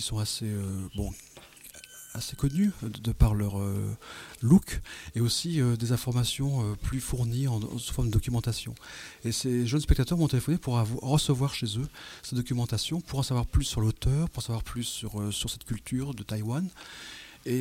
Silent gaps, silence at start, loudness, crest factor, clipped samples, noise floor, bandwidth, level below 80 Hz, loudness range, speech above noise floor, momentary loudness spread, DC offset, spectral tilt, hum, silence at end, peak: none; 0 s; -29 LUFS; 22 dB; under 0.1%; -50 dBFS; 16.5 kHz; -38 dBFS; 3 LU; 21 dB; 14 LU; under 0.1%; -5.5 dB/octave; none; 0 s; -6 dBFS